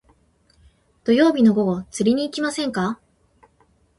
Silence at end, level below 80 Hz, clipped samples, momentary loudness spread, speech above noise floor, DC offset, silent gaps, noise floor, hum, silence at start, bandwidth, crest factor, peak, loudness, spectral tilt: 1.05 s; -58 dBFS; under 0.1%; 11 LU; 42 dB; under 0.1%; none; -60 dBFS; none; 1.05 s; 11.5 kHz; 18 dB; -4 dBFS; -20 LUFS; -5.5 dB/octave